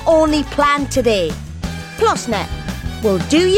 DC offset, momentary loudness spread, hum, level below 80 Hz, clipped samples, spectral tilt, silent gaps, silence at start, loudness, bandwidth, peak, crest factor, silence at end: under 0.1%; 12 LU; none; -32 dBFS; under 0.1%; -5 dB/octave; none; 0 s; -17 LUFS; 16.5 kHz; -4 dBFS; 14 dB; 0 s